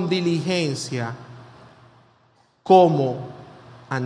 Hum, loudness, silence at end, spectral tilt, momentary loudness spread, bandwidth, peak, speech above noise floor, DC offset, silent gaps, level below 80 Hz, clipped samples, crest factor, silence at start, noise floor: none; -20 LUFS; 0 s; -6 dB/octave; 24 LU; 10.5 kHz; 0 dBFS; 40 dB; under 0.1%; none; -66 dBFS; under 0.1%; 22 dB; 0 s; -60 dBFS